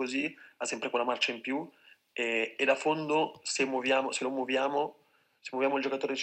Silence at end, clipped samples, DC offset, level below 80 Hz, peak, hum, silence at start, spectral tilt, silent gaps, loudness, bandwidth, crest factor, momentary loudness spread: 0 s; under 0.1%; under 0.1%; -86 dBFS; -12 dBFS; none; 0 s; -3 dB/octave; none; -31 LUFS; 9.2 kHz; 18 dB; 9 LU